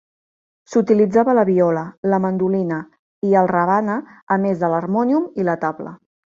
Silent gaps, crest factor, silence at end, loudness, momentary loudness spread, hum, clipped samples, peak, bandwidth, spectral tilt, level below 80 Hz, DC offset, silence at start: 1.98-2.03 s, 2.99-3.22 s, 4.23-4.27 s; 16 dB; 0.45 s; -18 LUFS; 10 LU; none; under 0.1%; -2 dBFS; 7.4 kHz; -9 dB/octave; -62 dBFS; under 0.1%; 0.7 s